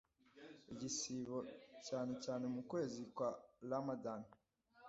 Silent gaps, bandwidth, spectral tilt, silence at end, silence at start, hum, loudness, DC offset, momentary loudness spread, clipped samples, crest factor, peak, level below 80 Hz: none; 7.6 kHz; -5.5 dB/octave; 0 s; 0.35 s; none; -46 LUFS; under 0.1%; 12 LU; under 0.1%; 18 dB; -30 dBFS; -82 dBFS